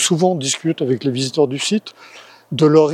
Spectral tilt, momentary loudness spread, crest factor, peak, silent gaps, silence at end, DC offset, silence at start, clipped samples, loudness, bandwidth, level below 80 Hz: -4.5 dB/octave; 9 LU; 16 dB; 0 dBFS; none; 0 s; under 0.1%; 0 s; under 0.1%; -18 LUFS; 14.5 kHz; -70 dBFS